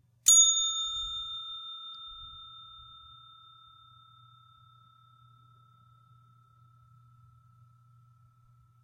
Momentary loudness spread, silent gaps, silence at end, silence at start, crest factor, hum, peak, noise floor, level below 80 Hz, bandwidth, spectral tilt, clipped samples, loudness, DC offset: 30 LU; none; 6 s; 0.25 s; 26 dB; none; -8 dBFS; -62 dBFS; -64 dBFS; 16 kHz; 3 dB/octave; under 0.1%; -24 LUFS; under 0.1%